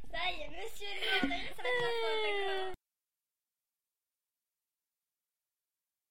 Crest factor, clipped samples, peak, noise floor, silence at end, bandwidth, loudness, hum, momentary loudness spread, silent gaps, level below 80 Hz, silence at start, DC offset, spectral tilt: 20 dB; under 0.1%; -18 dBFS; under -90 dBFS; 0 s; 16 kHz; -35 LUFS; none; 11 LU; none; -60 dBFS; 0 s; under 0.1%; -3 dB/octave